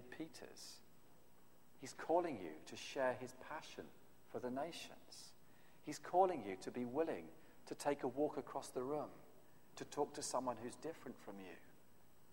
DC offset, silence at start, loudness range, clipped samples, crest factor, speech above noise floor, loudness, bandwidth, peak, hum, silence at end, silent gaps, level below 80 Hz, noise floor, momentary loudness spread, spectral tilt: under 0.1%; 0 s; 5 LU; under 0.1%; 24 dB; 26 dB; -45 LUFS; 16 kHz; -22 dBFS; none; 0.55 s; none; -78 dBFS; -70 dBFS; 18 LU; -4 dB/octave